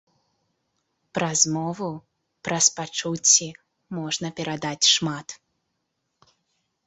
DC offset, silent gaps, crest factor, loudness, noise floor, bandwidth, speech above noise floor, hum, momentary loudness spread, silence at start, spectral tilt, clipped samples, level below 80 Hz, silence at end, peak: under 0.1%; none; 24 dB; -22 LUFS; -77 dBFS; 8.4 kHz; 53 dB; none; 18 LU; 1.15 s; -2 dB/octave; under 0.1%; -66 dBFS; 1.5 s; -2 dBFS